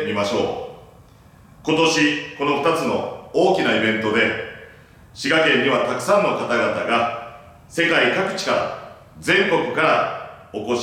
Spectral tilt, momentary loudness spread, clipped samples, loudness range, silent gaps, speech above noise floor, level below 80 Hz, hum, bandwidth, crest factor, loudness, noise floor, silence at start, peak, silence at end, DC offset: -4 dB/octave; 15 LU; under 0.1%; 2 LU; none; 29 dB; -58 dBFS; none; 16 kHz; 16 dB; -19 LUFS; -48 dBFS; 0 s; -4 dBFS; 0 s; under 0.1%